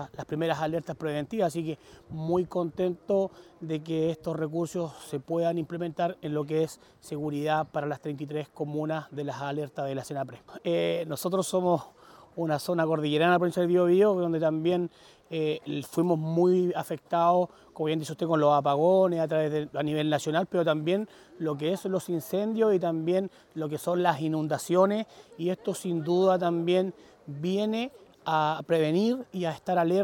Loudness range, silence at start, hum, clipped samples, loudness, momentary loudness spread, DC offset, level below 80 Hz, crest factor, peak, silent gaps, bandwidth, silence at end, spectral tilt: 6 LU; 0 s; none; under 0.1%; -28 LUFS; 11 LU; under 0.1%; -68 dBFS; 18 dB; -10 dBFS; none; 17.5 kHz; 0 s; -6.5 dB/octave